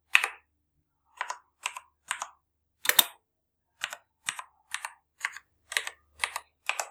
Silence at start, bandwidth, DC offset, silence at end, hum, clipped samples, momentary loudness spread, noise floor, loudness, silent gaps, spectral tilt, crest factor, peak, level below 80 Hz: 0.15 s; over 20 kHz; under 0.1%; 0 s; none; under 0.1%; 18 LU; -80 dBFS; -31 LUFS; none; 2.5 dB/octave; 34 dB; 0 dBFS; -76 dBFS